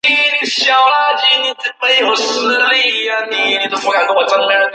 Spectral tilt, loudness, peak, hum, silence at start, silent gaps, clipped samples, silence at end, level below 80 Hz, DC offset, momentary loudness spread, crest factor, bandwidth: 0 dB/octave; -12 LUFS; 0 dBFS; none; 0.05 s; none; under 0.1%; 0 s; -72 dBFS; under 0.1%; 4 LU; 12 dB; 9.2 kHz